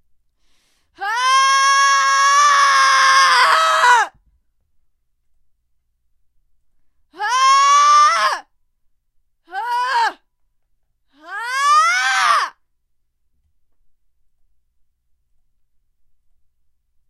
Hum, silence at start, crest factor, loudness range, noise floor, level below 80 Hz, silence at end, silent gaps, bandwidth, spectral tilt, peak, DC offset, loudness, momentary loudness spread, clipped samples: none; 1 s; 18 dB; 11 LU; -65 dBFS; -68 dBFS; 4.6 s; none; 14.5 kHz; 3.5 dB/octave; 0 dBFS; under 0.1%; -13 LUFS; 14 LU; under 0.1%